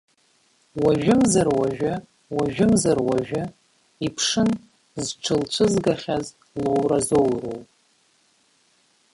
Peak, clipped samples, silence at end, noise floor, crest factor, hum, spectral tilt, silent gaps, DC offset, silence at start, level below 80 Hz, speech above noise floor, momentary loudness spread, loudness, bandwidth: -6 dBFS; under 0.1%; 1.5 s; -63 dBFS; 16 dB; none; -5 dB/octave; none; under 0.1%; 0.75 s; -52 dBFS; 41 dB; 13 LU; -22 LUFS; 11.5 kHz